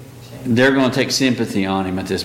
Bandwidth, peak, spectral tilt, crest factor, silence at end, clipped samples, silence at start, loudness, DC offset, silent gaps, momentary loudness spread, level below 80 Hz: 16.5 kHz; -4 dBFS; -4.5 dB/octave; 14 dB; 0 s; under 0.1%; 0 s; -17 LUFS; under 0.1%; none; 9 LU; -52 dBFS